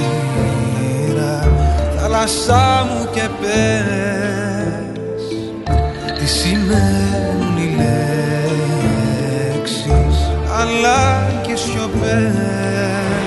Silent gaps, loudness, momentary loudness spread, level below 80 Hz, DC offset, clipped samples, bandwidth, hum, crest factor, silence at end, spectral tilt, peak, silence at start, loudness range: none; -17 LUFS; 6 LU; -24 dBFS; under 0.1%; under 0.1%; 12 kHz; none; 16 dB; 0 s; -5.5 dB/octave; 0 dBFS; 0 s; 3 LU